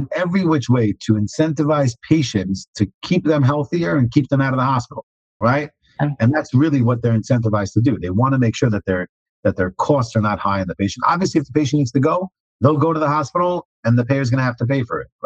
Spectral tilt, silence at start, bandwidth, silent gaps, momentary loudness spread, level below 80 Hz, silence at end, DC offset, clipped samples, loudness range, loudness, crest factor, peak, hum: -7 dB/octave; 0 s; 8.2 kHz; 2.68-2.73 s, 2.94-3.01 s, 5.03-5.40 s, 9.09-9.43 s, 12.40-12.59 s, 13.65-13.83 s; 6 LU; -52 dBFS; 0.2 s; under 0.1%; under 0.1%; 1 LU; -18 LUFS; 16 dB; -2 dBFS; none